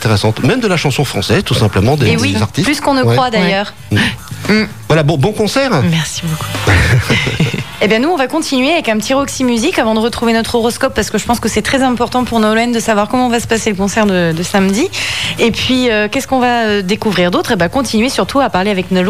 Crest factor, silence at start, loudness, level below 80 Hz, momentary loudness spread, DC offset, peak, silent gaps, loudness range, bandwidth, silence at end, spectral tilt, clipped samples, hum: 12 dB; 0 s; -13 LUFS; -34 dBFS; 3 LU; 1%; -2 dBFS; none; 1 LU; 15.5 kHz; 0 s; -5 dB/octave; under 0.1%; none